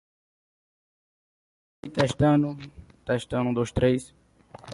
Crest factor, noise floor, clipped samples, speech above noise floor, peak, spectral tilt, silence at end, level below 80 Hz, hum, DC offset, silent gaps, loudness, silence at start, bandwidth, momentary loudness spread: 20 dB; -48 dBFS; under 0.1%; 24 dB; -8 dBFS; -7 dB/octave; 0 s; -48 dBFS; none; under 0.1%; none; -25 LUFS; 1.85 s; 11.5 kHz; 19 LU